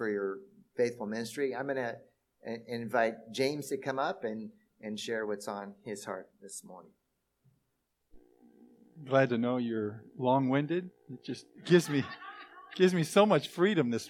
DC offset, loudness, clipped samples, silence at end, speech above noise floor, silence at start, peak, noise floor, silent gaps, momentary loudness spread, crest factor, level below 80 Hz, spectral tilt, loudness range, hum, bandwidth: under 0.1%; -32 LUFS; under 0.1%; 0 s; 48 dB; 0 s; -10 dBFS; -80 dBFS; none; 19 LU; 24 dB; -78 dBFS; -5.5 dB/octave; 12 LU; none; 16 kHz